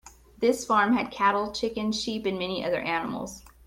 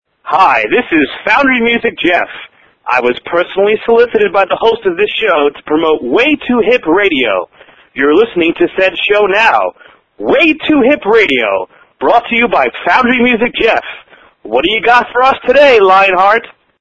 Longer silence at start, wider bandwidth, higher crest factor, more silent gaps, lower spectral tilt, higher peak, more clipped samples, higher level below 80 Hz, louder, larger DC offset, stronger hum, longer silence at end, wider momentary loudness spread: second, 0.05 s vs 0.25 s; first, 16.5 kHz vs 7.6 kHz; first, 18 dB vs 10 dB; neither; about the same, -4 dB/octave vs -5 dB/octave; second, -10 dBFS vs 0 dBFS; second, under 0.1% vs 0.2%; second, -56 dBFS vs -44 dBFS; second, -27 LUFS vs -10 LUFS; second, under 0.1% vs 0.3%; neither; second, 0.2 s vs 0.35 s; about the same, 7 LU vs 7 LU